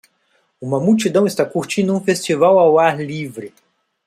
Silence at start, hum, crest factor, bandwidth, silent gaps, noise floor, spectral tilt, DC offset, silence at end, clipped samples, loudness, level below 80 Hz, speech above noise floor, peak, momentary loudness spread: 0.6 s; none; 16 dB; 15 kHz; none; -63 dBFS; -5.5 dB/octave; under 0.1%; 0.6 s; under 0.1%; -16 LUFS; -62 dBFS; 47 dB; 0 dBFS; 15 LU